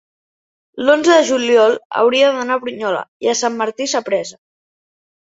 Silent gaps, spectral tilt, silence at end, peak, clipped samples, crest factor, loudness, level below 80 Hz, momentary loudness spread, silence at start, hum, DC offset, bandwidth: 1.85-1.90 s, 3.08-3.20 s; -2 dB/octave; 0.95 s; -2 dBFS; under 0.1%; 14 dB; -15 LUFS; -66 dBFS; 9 LU; 0.75 s; none; under 0.1%; 8 kHz